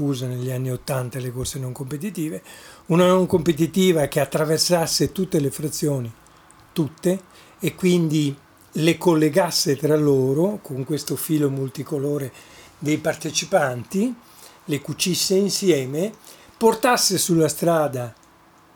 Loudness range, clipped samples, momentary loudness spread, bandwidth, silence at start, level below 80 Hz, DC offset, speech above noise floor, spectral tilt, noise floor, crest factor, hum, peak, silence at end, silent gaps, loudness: 5 LU; under 0.1%; 12 LU; over 20 kHz; 0 s; -54 dBFS; under 0.1%; 32 dB; -5 dB/octave; -53 dBFS; 18 dB; none; -4 dBFS; 0.65 s; none; -21 LUFS